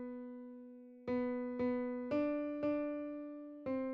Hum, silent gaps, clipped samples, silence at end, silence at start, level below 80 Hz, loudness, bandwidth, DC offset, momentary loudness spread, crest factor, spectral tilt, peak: none; none; under 0.1%; 0 s; 0 s; -72 dBFS; -40 LUFS; 5.2 kHz; under 0.1%; 13 LU; 14 dB; -6 dB/octave; -26 dBFS